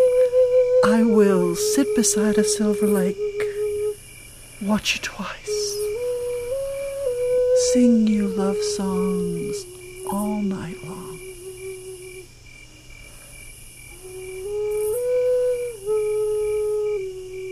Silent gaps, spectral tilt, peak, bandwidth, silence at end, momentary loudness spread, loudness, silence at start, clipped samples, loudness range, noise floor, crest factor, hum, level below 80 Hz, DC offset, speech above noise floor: none; -4.5 dB/octave; -6 dBFS; 15.5 kHz; 0 s; 21 LU; -21 LUFS; 0 s; under 0.1%; 14 LU; -44 dBFS; 16 dB; none; -48 dBFS; under 0.1%; 24 dB